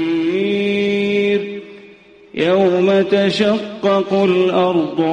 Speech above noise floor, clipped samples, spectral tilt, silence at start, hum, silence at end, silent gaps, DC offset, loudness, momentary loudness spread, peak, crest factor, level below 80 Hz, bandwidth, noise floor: 29 dB; under 0.1%; -6.5 dB/octave; 0 s; none; 0 s; none; under 0.1%; -16 LUFS; 6 LU; -4 dBFS; 12 dB; -58 dBFS; 9.4 kHz; -43 dBFS